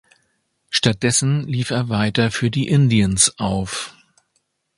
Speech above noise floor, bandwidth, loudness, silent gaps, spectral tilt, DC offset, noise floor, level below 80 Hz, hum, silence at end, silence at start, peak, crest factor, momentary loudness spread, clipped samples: 51 dB; 11.5 kHz; -18 LUFS; none; -4 dB/octave; under 0.1%; -69 dBFS; -44 dBFS; none; 0.85 s; 0.7 s; 0 dBFS; 20 dB; 8 LU; under 0.1%